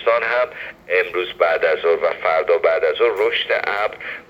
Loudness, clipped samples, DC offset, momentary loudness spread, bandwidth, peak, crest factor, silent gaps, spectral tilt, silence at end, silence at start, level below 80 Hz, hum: -18 LUFS; under 0.1%; under 0.1%; 6 LU; 15 kHz; -2 dBFS; 16 dB; none; -4 dB/octave; 0.05 s; 0 s; -58 dBFS; none